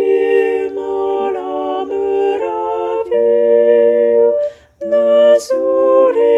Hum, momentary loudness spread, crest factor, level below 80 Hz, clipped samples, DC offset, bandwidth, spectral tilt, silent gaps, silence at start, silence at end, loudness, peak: none; 9 LU; 12 dB; -56 dBFS; under 0.1%; under 0.1%; 11.5 kHz; -4.5 dB/octave; none; 0 s; 0 s; -14 LUFS; 0 dBFS